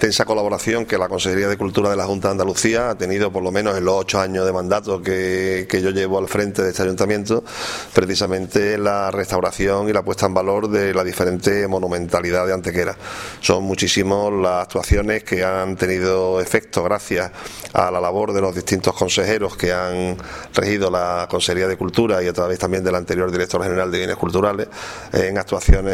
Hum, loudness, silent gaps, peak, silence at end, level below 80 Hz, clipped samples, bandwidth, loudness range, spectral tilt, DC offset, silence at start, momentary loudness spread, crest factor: none; -19 LUFS; none; 0 dBFS; 0 s; -32 dBFS; under 0.1%; 16 kHz; 1 LU; -4.5 dB/octave; under 0.1%; 0 s; 4 LU; 18 dB